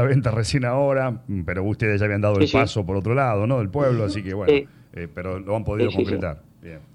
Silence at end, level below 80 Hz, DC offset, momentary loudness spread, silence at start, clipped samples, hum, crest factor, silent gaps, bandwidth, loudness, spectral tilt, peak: 0.15 s; -44 dBFS; under 0.1%; 12 LU; 0 s; under 0.1%; none; 16 dB; none; 11 kHz; -22 LUFS; -7 dB/octave; -6 dBFS